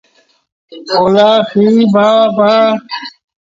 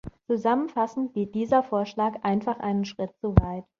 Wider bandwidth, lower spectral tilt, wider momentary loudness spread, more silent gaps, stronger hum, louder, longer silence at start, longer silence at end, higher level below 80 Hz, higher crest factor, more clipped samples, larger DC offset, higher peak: about the same, 7.6 kHz vs 7.2 kHz; second, -6.5 dB/octave vs -8.5 dB/octave; first, 15 LU vs 6 LU; neither; neither; first, -10 LUFS vs -26 LUFS; first, 0.7 s vs 0.05 s; first, 0.5 s vs 0.15 s; second, -56 dBFS vs -38 dBFS; second, 12 dB vs 24 dB; neither; neither; about the same, 0 dBFS vs -2 dBFS